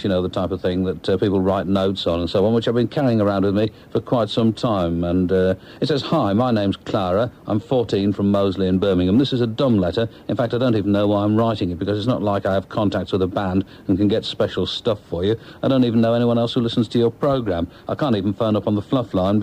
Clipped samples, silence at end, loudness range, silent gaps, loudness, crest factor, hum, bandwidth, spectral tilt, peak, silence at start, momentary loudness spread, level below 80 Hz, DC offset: under 0.1%; 0 s; 2 LU; none; -20 LUFS; 10 dB; none; 10.5 kHz; -8 dB/octave; -8 dBFS; 0 s; 5 LU; -48 dBFS; under 0.1%